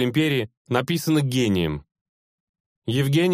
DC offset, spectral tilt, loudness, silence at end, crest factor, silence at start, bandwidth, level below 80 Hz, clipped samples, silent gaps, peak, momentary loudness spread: under 0.1%; -6 dB/octave; -23 LUFS; 0 s; 18 dB; 0 s; 15.5 kHz; -50 dBFS; under 0.1%; 0.57-0.65 s, 2.01-2.54 s, 2.60-2.82 s; -4 dBFS; 7 LU